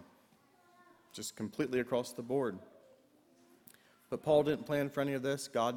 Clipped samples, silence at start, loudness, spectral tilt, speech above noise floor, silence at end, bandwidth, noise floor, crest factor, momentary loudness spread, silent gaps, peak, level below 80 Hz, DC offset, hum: under 0.1%; 0 s; -35 LUFS; -5 dB/octave; 33 dB; 0 s; 19 kHz; -67 dBFS; 20 dB; 14 LU; none; -18 dBFS; -72 dBFS; under 0.1%; none